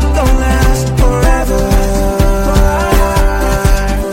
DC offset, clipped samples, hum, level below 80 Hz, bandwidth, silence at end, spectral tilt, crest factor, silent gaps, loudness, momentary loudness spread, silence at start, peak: under 0.1%; under 0.1%; none; -12 dBFS; 16.5 kHz; 0 s; -5.5 dB/octave; 10 dB; none; -12 LUFS; 2 LU; 0 s; 0 dBFS